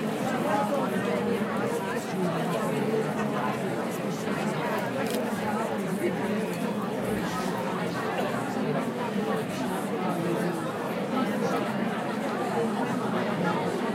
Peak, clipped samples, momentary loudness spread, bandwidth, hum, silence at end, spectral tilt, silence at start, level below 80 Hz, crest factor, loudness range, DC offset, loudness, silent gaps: -14 dBFS; under 0.1%; 3 LU; 16 kHz; none; 0 s; -6 dB/octave; 0 s; -64 dBFS; 14 dB; 1 LU; under 0.1%; -29 LUFS; none